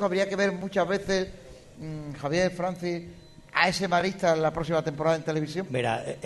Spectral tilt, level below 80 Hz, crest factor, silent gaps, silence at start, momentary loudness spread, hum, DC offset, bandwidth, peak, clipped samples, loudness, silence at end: -5 dB/octave; -54 dBFS; 22 dB; none; 0 s; 12 LU; none; under 0.1%; 12 kHz; -6 dBFS; under 0.1%; -27 LUFS; 0 s